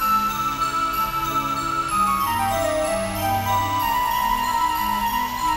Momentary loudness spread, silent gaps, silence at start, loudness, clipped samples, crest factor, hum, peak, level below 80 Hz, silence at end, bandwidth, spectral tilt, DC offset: 3 LU; none; 0 s; -22 LUFS; under 0.1%; 12 dB; none; -10 dBFS; -42 dBFS; 0 s; 16.5 kHz; -3.5 dB/octave; under 0.1%